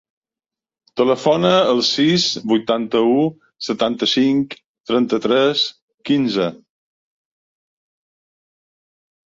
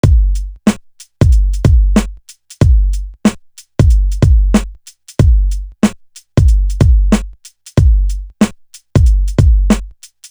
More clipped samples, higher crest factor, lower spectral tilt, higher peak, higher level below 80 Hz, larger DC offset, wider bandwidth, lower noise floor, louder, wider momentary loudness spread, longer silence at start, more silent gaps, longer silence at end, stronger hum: neither; first, 18 dB vs 12 dB; second, -5 dB/octave vs -7 dB/octave; about the same, -2 dBFS vs 0 dBFS; second, -62 dBFS vs -14 dBFS; neither; second, 7.8 kHz vs over 20 kHz; first, -89 dBFS vs -36 dBFS; second, -17 LUFS vs -14 LUFS; about the same, 10 LU vs 8 LU; first, 0.95 s vs 0.05 s; first, 4.66-4.74 s, 4.80-4.84 s, 5.82-5.88 s, 5.94-5.98 s vs none; first, 2.7 s vs 0.4 s; neither